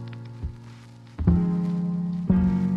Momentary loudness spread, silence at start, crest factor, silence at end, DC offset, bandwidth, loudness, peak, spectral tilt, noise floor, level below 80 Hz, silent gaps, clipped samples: 22 LU; 0 s; 18 dB; 0 s; under 0.1%; 5.4 kHz; -24 LUFS; -8 dBFS; -10.5 dB/octave; -45 dBFS; -36 dBFS; none; under 0.1%